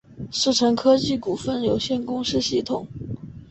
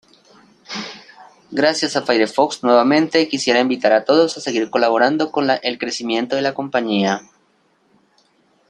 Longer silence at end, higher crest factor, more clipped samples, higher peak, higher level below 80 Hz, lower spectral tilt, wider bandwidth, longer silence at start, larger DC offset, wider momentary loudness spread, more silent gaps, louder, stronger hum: second, 0.05 s vs 1.5 s; about the same, 18 dB vs 18 dB; neither; second, -6 dBFS vs 0 dBFS; first, -50 dBFS vs -66 dBFS; about the same, -4.5 dB/octave vs -4 dB/octave; second, 8.4 kHz vs 11 kHz; second, 0.1 s vs 0.7 s; neither; first, 15 LU vs 11 LU; neither; second, -22 LUFS vs -17 LUFS; neither